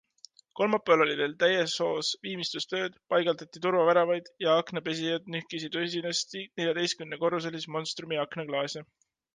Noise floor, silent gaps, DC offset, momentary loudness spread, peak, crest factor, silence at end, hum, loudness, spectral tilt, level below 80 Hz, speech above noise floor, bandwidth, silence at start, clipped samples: -57 dBFS; none; under 0.1%; 10 LU; -10 dBFS; 20 dB; 0.5 s; none; -29 LUFS; -3.5 dB/octave; -78 dBFS; 28 dB; 9.8 kHz; 0.55 s; under 0.1%